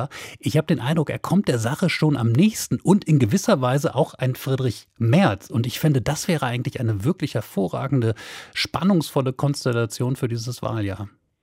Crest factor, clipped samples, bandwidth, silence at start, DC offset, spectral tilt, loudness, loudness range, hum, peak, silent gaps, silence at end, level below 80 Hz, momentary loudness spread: 18 dB; under 0.1%; 16 kHz; 0 s; under 0.1%; -6 dB/octave; -22 LUFS; 4 LU; none; -4 dBFS; none; 0.35 s; -54 dBFS; 8 LU